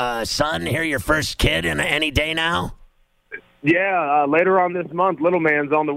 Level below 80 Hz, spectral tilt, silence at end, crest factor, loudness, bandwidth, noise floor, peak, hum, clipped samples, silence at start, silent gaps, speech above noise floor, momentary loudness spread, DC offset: -36 dBFS; -4.5 dB/octave; 0 s; 16 dB; -19 LUFS; 16 kHz; -53 dBFS; -4 dBFS; none; under 0.1%; 0 s; none; 34 dB; 7 LU; under 0.1%